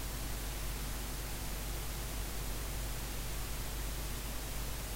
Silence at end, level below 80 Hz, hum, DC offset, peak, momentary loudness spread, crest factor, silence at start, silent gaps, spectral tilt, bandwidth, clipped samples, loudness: 0 s; -42 dBFS; none; under 0.1%; -26 dBFS; 0 LU; 12 dB; 0 s; none; -3.5 dB/octave; 16 kHz; under 0.1%; -41 LUFS